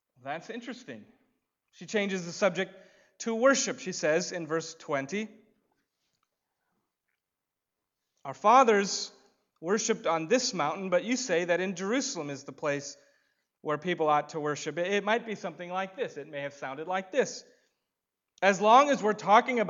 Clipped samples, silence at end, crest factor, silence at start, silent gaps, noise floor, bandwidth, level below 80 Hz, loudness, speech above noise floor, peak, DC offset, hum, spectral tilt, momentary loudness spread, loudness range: under 0.1%; 0 s; 24 dB; 0.25 s; none; -88 dBFS; 7.8 kHz; -86 dBFS; -28 LUFS; 59 dB; -6 dBFS; under 0.1%; none; -3.5 dB/octave; 17 LU; 8 LU